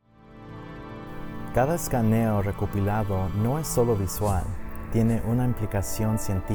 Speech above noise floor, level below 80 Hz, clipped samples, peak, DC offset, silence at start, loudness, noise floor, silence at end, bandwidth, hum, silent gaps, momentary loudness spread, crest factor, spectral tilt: 23 dB; -38 dBFS; under 0.1%; -10 dBFS; under 0.1%; 0.25 s; -26 LUFS; -47 dBFS; 0 s; over 20 kHz; none; none; 16 LU; 16 dB; -6.5 dB/octave